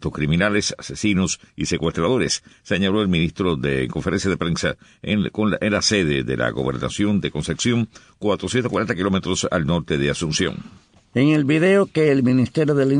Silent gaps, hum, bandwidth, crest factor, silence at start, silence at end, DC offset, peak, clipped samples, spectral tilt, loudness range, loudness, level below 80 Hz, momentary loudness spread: none; none; 10.5 kHz; 14 dB; 0 s; 0 s; under 0.1%; -6 dBFS; under 0.1%; -5 dB/octave; 3 LU; -20 LUFS; -44 dBFS; 8 LU